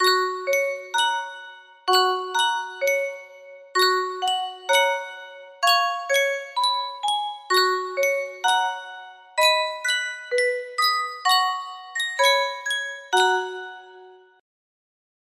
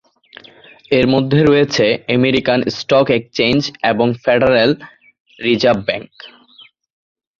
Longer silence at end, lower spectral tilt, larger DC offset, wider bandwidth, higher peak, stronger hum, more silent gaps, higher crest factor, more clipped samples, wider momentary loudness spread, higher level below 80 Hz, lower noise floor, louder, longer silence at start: first, 1.25 s vs 1.1 s; second, 1 dB/octave vs -6 dB/octave; neither; first, 16 kHz vs 7.4 kHz; second, -6 dBFS vs 0 dBFS; neither; second, none vs 5.20-5.25 s; about the same, 18 dB vs 16 dB; neither; first, 13 LU vs 6 LU; second, -78 dBFS vs -48 dBFS; about the same, -48 dBFS vs -47 dBFS; second, -22 LUFS vs -15 LUFS; second, 0 s vs 0.9 s